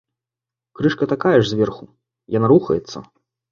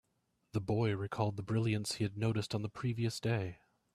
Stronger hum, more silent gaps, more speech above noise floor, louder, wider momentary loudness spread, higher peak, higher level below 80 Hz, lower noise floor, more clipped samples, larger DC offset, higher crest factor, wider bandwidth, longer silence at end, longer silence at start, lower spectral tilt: neither; neither; first, 70 dB vs 44 dB; first, -18 LUFS vs -36 LUFS; first, 18 LU vs 5 LU; first, -2 dBFS vs -18 dBFS; first, -54 dBFS vs -66 dBFS; first, -88 dBFS vs -79 dBFS; neither; neither; about the same, 18 dB vs 18 dB; second, 7.4 kHz vs 13.5 kHz; about the same, 0.5 s vs 0.4 s; first, 0.8 s vs 0.55 s; about the same, -7 dB/octave vs -6 dB/octave